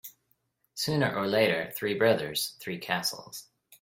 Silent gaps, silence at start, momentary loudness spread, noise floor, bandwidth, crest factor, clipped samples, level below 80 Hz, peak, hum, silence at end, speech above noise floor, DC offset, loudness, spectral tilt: none; 0.05 s; 18 LU; -74 dBFS; 16.5 kHz; 22 dB; under 0.1%; -68 dBFS; -8 dBFS; none; 0.05 s; 45 dB; under 0.1%; -28 LUFS; -4 dB/octave